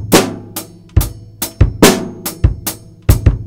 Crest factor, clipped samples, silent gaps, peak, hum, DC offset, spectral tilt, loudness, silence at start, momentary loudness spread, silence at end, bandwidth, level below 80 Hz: 14 dB; 1%; none; 0 dBFS; none; under 0.1%; -5 dB/octave; -15 LUFS; 0 s; 13 LU; 0 s; over 20 kHz; -20 dBFS